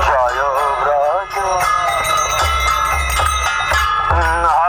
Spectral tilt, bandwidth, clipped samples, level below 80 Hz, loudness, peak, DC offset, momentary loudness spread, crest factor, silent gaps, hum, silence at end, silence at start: -2.5 dB/octave; over 20 kHz; under 0.1%; -26 dBFS; -15 LUFS; -2 dBFS; under 0.1%; 2 LU; 14 dB; none; none; 0 s; 0 s